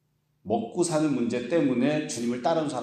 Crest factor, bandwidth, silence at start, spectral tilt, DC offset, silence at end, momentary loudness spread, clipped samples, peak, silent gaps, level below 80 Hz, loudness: 14 dB; 13 kHz; 0.45 s; -5.5 dB/octave; under 0.1%; 0 s; 5 LU; under 0.1%; -12 dBFS; none; -70 dBFS; -26 LUFS